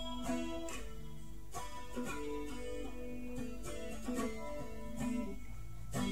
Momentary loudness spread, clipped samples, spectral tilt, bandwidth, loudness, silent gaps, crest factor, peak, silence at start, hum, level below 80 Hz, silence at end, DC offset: 10 LU; under 0.1%; -5 dB/octave; 16 kHz; -44 LUFS; none; 16 dB; -24 dBFS; 0 s; none; -52 dBFS; 0 s; 0.7%